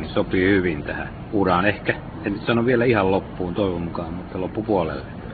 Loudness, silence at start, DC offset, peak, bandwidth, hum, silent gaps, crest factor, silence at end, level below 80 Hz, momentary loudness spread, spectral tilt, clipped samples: -22 LUFS; 0 s; under 0.1%; -4 dBFS; 4.8 kHz; none; none; 18 dB; 0 s; -42 dBFS; 11 LU; -11.5 dB/octave; under 0.1%